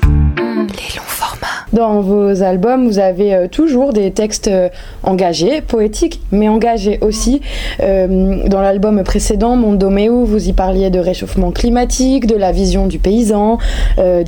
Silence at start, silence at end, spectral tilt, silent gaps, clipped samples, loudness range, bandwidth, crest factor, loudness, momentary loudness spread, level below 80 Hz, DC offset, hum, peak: 0 s; 0 s; -6 dB/octave; none; under 0.1%; 1 LU; 18 kHz; 12 dB; -13 LUFS; 6 LU; -20 dBFS; under 0.1%; none; 0 dBFS